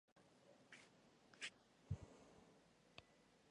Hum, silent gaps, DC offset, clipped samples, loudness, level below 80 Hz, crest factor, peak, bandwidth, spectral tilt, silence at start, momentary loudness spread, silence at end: none; 0.12-0.16 s; under 0.1%; under 0.1%; -58 LUFS; -70 dBFS; 24 dB; -36 dBFS; 11 kHz; -4 dB/octave; 0.1 s; 13 LU; 0 s